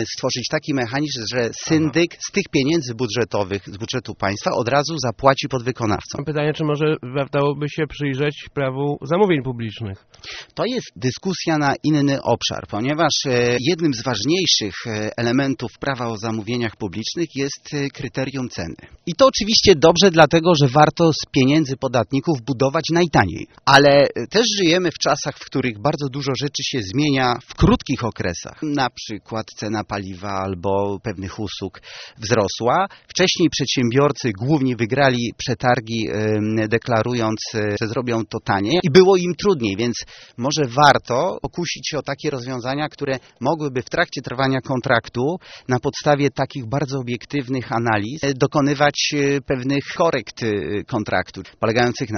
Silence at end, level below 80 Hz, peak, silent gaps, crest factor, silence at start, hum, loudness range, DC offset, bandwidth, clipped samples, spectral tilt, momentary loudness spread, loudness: 0 s; -46 dBFS; 0 dBFS; none; 20 dB; 0 s; none; 7 LU; under 0.1%; 6.8 kHz; under 0.1%; -4 dB/octave; 11 LU; -20 LUFS